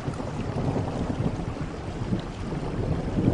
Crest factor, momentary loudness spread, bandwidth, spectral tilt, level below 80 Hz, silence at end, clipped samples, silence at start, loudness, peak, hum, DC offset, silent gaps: 20 dB; 5 LU; 10.5 kHz; -8 dB/octave; -38 dBFS; 0 s; under 0.1%; 0 s; -30 LUFS; -8 dBFS; none; under 0.1%; none